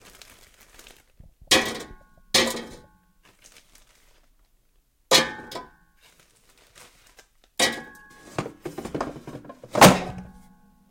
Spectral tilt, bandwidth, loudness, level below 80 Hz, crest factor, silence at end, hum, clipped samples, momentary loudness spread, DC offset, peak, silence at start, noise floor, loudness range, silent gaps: -3 dB/octave; 17 kHz; -21 LUFS; -52 dBFS; 26 dB; 0.65 s; none; under 0.1%; 27 LU; under 0.1%; -2 dBFS; 1.5 s; -64 dBFS; 8 LU; none